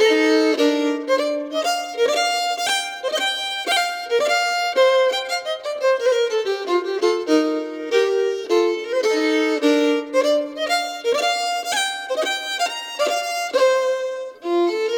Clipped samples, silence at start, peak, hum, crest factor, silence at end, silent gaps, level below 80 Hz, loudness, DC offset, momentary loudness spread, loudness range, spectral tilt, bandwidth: under 0.1%; 0 s; -6 dBFS; none; 14 dB; 0 s; none; -74 dBFS; -20 LUFS; under 0.1%; 6 LU; 2 LU; -0.5 dB/octave; 18.5 kHz